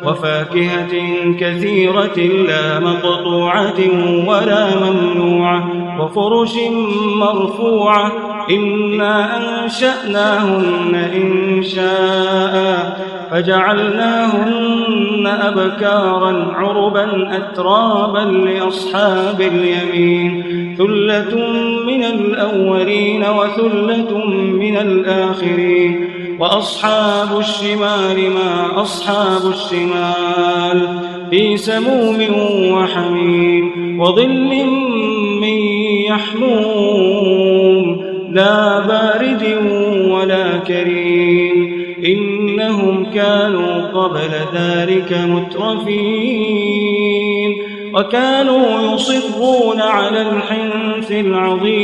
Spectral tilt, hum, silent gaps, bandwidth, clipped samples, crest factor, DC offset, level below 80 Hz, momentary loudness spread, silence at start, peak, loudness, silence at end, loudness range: -6 dB/octave; none; none; 11.5 kHz; under 0.1%; 14 dB; under 0.1%; -58 dBFS; 5 LU; 0 s; 0 dBFS; -14 LUFS; 0 s; 2 LU